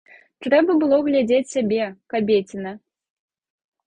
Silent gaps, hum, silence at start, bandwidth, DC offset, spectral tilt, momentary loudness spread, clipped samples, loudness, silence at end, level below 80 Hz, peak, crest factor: none; none; 0.4 s; 9.4 kHz; under 0.1%; -5.5 dB/octave; 15 LU; under 0.1%; -20 LUFS; 1.1 s; -62 dBFS; -4 dBFS; 16 dB